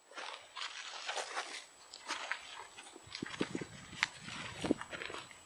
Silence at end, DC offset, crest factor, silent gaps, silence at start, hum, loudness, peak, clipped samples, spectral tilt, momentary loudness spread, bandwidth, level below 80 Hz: 0 s; under 0.1%; 32 dB; none; 0 s; none; -42 LUFS; -10 dBFS; under 0.1%; -3 dB/octave; 11 LU; over 20 kHz; -70 dBFS